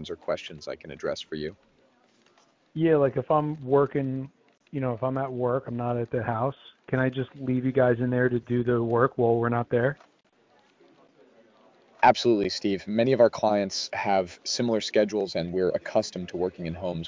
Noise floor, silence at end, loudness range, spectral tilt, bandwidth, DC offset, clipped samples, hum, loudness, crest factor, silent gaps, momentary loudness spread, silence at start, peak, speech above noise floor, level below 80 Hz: -63 dBFS; 0 s; 4 LU; -6 dB/octave; 7.6 kHz; under 0.1%; under 0.1%; none; -26 LUFS; 20 dB; none; 11 LU; 0 s; -6 dBFS; 37 dB; -58 dBFS